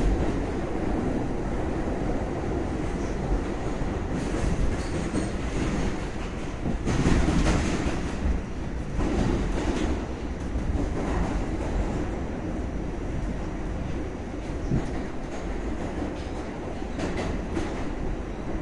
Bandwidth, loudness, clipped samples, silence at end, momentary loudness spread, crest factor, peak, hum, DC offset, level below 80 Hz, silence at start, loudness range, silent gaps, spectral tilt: 11 kHz; -30 LUFS; under 0.1%; 0 s; 8 LU; 20 dB; -8 dBFS; none; under 0.1%; -32 dBFS; 0 s; 5 LU; none; -6.5 dB/octave